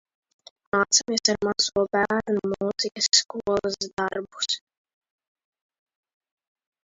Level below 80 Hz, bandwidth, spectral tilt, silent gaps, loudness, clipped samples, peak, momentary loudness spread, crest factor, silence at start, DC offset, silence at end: -60 dBFS; 7.8 kHz; -2 dB/octave; 3.93-3.97 s; -24 LUFS; under 0.1%; -6 dBFS; 9 LU; 22 dB; 0.75 s; under 0.1%; 2.3 s